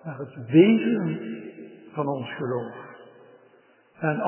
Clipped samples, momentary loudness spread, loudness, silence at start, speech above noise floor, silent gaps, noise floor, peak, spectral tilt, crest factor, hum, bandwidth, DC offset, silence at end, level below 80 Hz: under 0.1%; 24 LU; -23 LUFS; 0.05 s; 35 dB; none; -58 dBFS; -4 dBFS; -11.5 dB/octave; 22 dB; none; 3.2 kHz; under 0.1%; 0 s; -74 dBFS